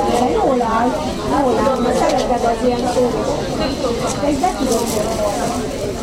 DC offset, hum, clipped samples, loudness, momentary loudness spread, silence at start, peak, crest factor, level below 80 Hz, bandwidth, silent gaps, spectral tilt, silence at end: under 0.1%; none; under 0.1%; -17 LUFS; 5 LU; 0 s; -2 dBFS; 14 dB; -34 dBFS; 16 kHz; none; -5 dB/octave; 0 s